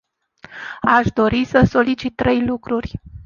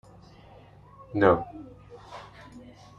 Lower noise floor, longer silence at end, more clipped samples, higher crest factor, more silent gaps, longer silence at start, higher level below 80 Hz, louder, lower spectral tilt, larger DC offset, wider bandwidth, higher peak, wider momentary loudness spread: second, -46 dBFS vs -52 dBFS; second, 0.05 s vs 0.4 s; neither; second, 18 dB vs 26 dB; neither; second, 0.5 s vs 1.1 s; first, -38 dBFS vs -58 dBFS; first, -17 LUFS vs -24 LUFS; about the same, -7 dB/octave vs -8 dB/octave; neither; about the same, 7 kHz vs 7.6 kHz; about the same, -2 dBFS vs -4 dBFS; second, 17 LU vs 26 LU